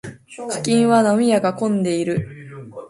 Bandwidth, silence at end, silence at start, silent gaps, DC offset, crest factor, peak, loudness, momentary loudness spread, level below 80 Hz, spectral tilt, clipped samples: 11.5 kHz; 0 s; 0.05 s; none; under 0.1%; 16 dB; -2 dBFS; -18 LUFS; 20 LU; -56 dBFS; -5.5 dB/octave; under 0.1%